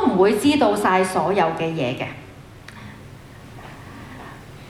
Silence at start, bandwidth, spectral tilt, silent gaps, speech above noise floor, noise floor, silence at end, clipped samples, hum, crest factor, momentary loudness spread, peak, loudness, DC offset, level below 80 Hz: 0 s; 14.5 kHz; -5.5 dB/octave; none; 22 dB; -41 dBFS; 0 s; under 0.1%; none; 18 dB; 24 LU; -4 dBFS; -19 LUFS; under 0.1%; -52 dBFS